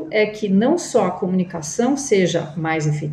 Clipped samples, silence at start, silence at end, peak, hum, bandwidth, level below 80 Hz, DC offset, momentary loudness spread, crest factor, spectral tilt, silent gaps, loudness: under 0.1%; 0 s; 0 s; -6 dBFS; none; 12 kHz; -58 dBFS; under 0.1%; 5 LU; 14 dB; -5.5 dB/octave; none; -19 LUFS